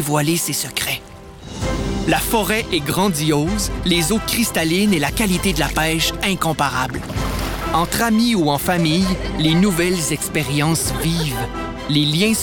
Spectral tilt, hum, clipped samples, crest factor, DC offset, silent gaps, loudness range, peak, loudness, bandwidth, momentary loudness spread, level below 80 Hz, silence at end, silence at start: -4 dB/octave; none; under 0.1%; 14 dB; under 0.1%; none; 2 LU; -4 dBFS; -18 LUFS; over 20 kHz; 7 LU; -32 dBFS; 0 s; 0 s